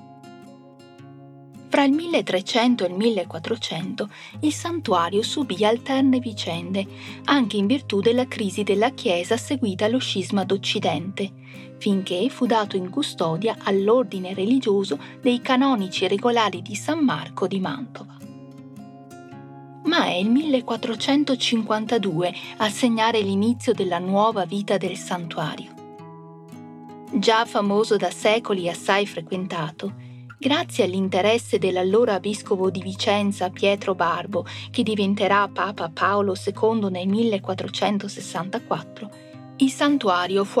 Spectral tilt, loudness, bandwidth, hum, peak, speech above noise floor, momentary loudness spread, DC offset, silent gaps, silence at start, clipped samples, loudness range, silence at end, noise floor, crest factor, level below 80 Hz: -5 dB/octave; -22 LUFS; 13.5 kHz; none; -4 dBFS; 24 dB; 15 LU; under 0.1%; none; 0 s; under 0.1%; 3 LU; 0 s; -46 dBFS; 18 dB; -74 dBFS